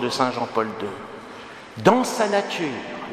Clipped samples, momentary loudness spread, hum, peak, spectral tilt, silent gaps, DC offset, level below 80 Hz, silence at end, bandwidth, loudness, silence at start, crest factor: under 0.1%; 19 LU; none; 0 dBFS; -4.5 dB/octave; none; under 0.1%; -64 dBFS; 0 s; 15.5 kHz; -23 LUFS; 0 s; 24 dB